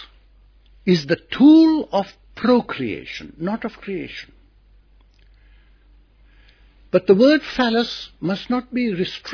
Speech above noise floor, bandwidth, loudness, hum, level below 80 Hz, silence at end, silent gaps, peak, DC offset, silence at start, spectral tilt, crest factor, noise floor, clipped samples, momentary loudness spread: 34 dB; 5.4 kHz; -19 LUFS; none; -52 dBFS; 0 s; none; -2 dBFS; under 0.1%; 0 s; -7 dB/octave; 18 dB; -52 dBFS; under 0.1%; 16 LU